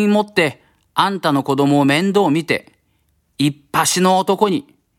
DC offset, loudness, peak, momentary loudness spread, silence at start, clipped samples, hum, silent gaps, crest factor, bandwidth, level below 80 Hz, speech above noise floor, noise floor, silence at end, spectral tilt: under 0.1%; -17 LUFS; 0 dBFS; 6 LU; 0 s; under 0.1%; none; none; 16 dB; 16.5 kHz; -62 dBFS; 47 dB; -63 dBFS; 0.35 s; -4.5 dB/octave